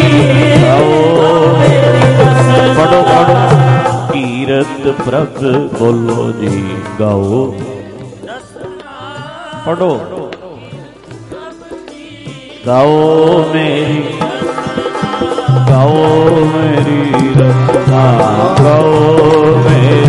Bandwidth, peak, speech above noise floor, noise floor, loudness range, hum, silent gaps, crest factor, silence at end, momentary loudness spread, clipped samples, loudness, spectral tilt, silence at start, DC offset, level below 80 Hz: 11.5 kHz; 0 dBFS; 22 dB; -31 dBFS; 13 LU; none; none; 10 dB; 0 s; 21 LU; under 0.1%; -9 LUFS; -7 dB/octave; 0 s; under 0.1%; -40 dBFS